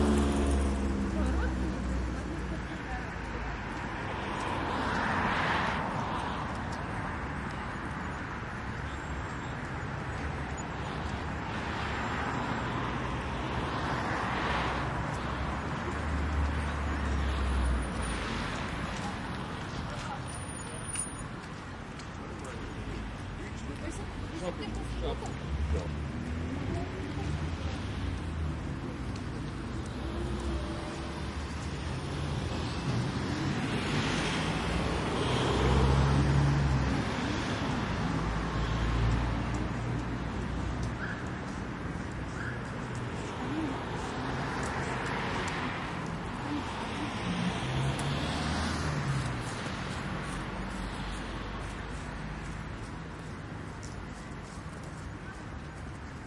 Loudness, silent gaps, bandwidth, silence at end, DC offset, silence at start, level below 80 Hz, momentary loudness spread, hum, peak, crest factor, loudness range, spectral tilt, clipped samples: -34 LUFS; none; 11.5 kHz; 0 s; under 0.1%; 0 s; -40 dBFS; 10 LU; none; -14 dBFS; 20 dB; 9 LU; -5.5 dB/octave; under 0.1%